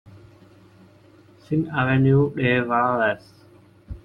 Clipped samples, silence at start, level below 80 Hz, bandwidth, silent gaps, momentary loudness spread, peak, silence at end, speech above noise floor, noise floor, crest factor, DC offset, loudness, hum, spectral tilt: under 0.1%; 0.05 s; -50 dBFS; 5.6 kHz; none; 9 LU; -6 dBFS; 0.05 s; 32 dB; -52 dBFS; 16 dB; under 0.1%; -21 LUFS; none; -9 dB/octave